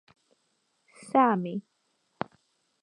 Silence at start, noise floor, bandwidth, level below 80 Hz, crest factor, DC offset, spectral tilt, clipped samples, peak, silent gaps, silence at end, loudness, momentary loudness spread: 1.05 s; -74 dBFS; 10.5 kHz; -78 dBFS; 22 dB; under 0.1%; -7 dB/octave; under 0.1%; -8 dBFS; none; 1.25 s; -28 LUFS; 16 LU